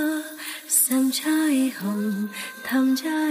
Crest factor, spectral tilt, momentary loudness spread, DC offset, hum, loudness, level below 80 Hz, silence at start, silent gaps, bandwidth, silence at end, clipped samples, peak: 16 dB; -3 dB/octave; 12 LU; under 0.1%; none; -23 LUFS; -74 dBFS; 0 s; none; 15.5 kHz; 0 s; under 0.1%; -6 dBFS